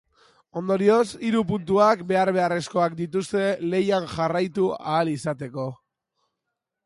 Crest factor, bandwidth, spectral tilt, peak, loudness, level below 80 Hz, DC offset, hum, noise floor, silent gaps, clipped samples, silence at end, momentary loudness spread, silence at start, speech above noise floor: 18 dB; 11.5 kHz; -6 dB/octave; -6 dBFS; -23 LUFS; -60 dBFS; under 0.1%; none; -83 dBFS; none; under 0.1%; 1.1 s; 11 LU; 0.55 s; 60 dB